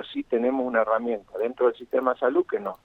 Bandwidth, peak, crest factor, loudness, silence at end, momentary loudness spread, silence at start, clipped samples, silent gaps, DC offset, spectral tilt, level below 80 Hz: 4.2 kHz; -8 dBFS; 16 dB; -25 LUFS; 0.1 s; 6 LU; 0 s; under 0.1%; none; under 0.1%; -7 dB/octave; -64 dBFS